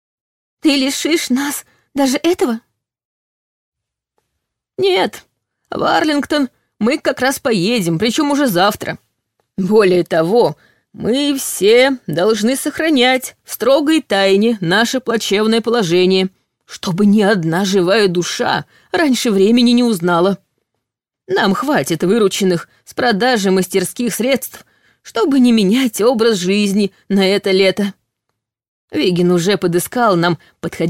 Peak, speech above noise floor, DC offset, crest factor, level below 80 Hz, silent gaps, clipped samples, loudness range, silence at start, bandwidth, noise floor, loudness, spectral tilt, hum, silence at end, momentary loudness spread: -2 dBFS; 64 dB; under 0.1%; 14 dB; -56 dBFS; 3.05-3.72 s, 28.68-28.88 s; under 0.1%; 5 LU; 0.65 s; 16.5 kHz; -79 dBFS; -15 LUFS; -4.5 dB/octave; none; 0 s; 10 LU